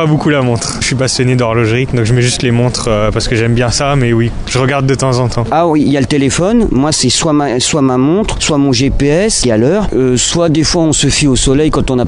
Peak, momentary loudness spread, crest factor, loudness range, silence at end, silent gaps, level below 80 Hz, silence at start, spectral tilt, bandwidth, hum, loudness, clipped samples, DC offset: 0 dBFS; 3 LU; 10 dB; 2 LU; 0 s; none; -24 dBFS; 0 s; -4.5 dB/octave; 11 kHz; none; -11 LUFS; under 0.1%; under 0.1%